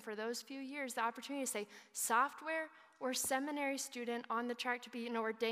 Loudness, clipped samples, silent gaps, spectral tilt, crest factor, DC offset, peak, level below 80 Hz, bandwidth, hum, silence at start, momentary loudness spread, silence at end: -40 LUFS; under 0.1%; none; -1.5 dB/octave; 20 dB; under 0.1%; -20 dBFS; -90 dBFS; 15.5 kHz; none; 0 s; 9 LU; 0 s